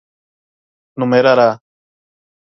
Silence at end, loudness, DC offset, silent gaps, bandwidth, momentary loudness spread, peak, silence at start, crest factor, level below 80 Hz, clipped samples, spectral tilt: 0.85 s; -13 LUFS; under 0.1%; none; 6.2 kHz; 19 LU; 0 dBFS; 0.95 s; 18 dB; -66 dBFS; under 0.1%; -7 dB/octave